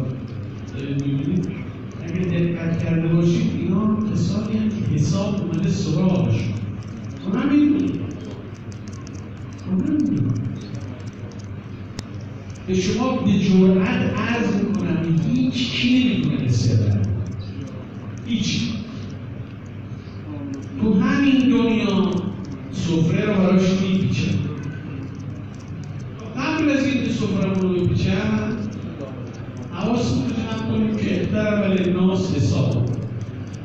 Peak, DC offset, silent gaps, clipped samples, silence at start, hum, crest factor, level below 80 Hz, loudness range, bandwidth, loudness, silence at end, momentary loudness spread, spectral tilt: -6 dBFS; under 0.1%; none; under 0.1%; 0 s; none; 16 dB; -44 dBFS; 7 LU; 7.8 kHz; -21 LUFS; 0 s; 16 LU; -7 dB/octave